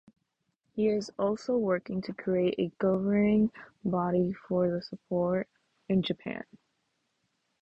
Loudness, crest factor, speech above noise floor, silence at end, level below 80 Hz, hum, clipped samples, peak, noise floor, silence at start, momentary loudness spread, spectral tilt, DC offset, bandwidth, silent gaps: -30 LUFS; 14 dB; 50 dB; 1.2 s; -64 dBFS; none; under 0.1%; -16 dBFS; -79 dBFS; 0.75 s; 11 LU; -7.5 dB/octave; under 0.1%; 8 kHz; none